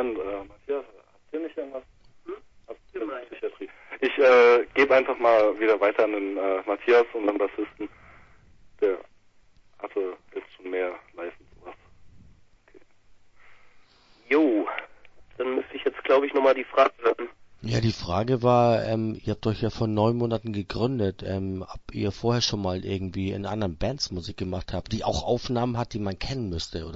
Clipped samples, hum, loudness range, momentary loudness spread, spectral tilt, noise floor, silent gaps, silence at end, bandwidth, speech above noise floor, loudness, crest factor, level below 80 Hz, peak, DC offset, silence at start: under 0.1%; none; 15 LU; 17 LU; -6 dB/octave; -56 dBFS; none; 0 s; 7.8 kHz; 32 dB; -25 LUFS; 20 dB; -48 dBFS; -6 dBFS; under 0.1%; 0 s